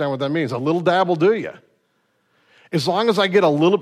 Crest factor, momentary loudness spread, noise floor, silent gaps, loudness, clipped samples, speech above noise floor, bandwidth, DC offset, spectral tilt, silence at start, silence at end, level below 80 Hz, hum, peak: 14 dB; 8 LU; -66 dBFS; none; -19 LUFS; under 0.1%; 48 dB; 13.5 kHz; under 0.1%; -6 dB/octave; 0 s; 0 s; -68 dBFS; none; -4 dBFS